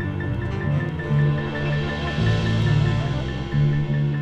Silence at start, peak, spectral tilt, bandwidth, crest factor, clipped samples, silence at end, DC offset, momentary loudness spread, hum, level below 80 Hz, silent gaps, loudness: 0 s; -8 dBFS; -7.5 dB/octave; 7.8 kHz; 12 dB; under 0.1%; 0 s; under 0.1%; 6 LU; none; -36 dBFS; none; -23 LUFS